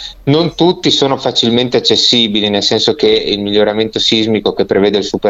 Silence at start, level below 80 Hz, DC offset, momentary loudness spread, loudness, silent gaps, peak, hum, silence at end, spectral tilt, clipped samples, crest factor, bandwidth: 0 s; -44 dBFS; under 0.1%; 5 LU; -11 LUFS; none; 0 dBFS; none; 0 s; -4.5 dB/octave; under 0.1%; 12 dB; 8 kHz